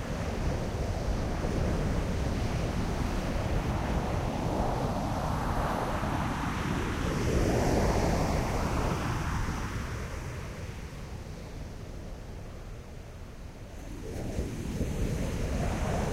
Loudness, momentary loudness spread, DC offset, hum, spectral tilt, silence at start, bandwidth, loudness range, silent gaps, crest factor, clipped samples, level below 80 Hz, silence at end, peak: -32 LUFS; 15 LU; under 0.1%; none; -6 dB/octave; 0 s; 16 kHz; 12 LU; none; 16 dB; under 0.1%; -36 dBFS; 0 s; -14 dBFS